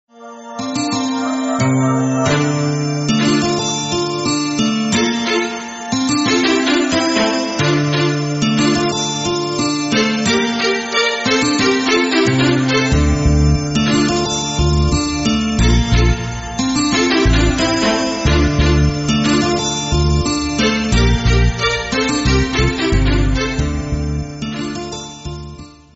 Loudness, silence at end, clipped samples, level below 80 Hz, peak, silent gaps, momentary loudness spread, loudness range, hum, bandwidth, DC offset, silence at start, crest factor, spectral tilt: -16 LUFS; 0.25 s; under 0.1%; -24 dBFS; -2 dBFS; none; 7 LU; 2 LU; none; 8.2 kHz; under 0.1%; 0.2 s; 12 dB; -4.5 dB/octave